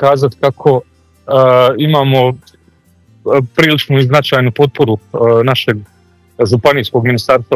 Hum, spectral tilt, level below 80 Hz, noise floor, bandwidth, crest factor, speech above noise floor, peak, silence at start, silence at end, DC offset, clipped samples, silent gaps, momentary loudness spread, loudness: none; -6.5 dB/octave; -46 dBFS; -49 dBFS; 15 kHz; 12 dB; 39 dB; 0 dBFS; 0 s; 0 s; under 0.1%; 0.3%; none; 6 LU; -11 LUFS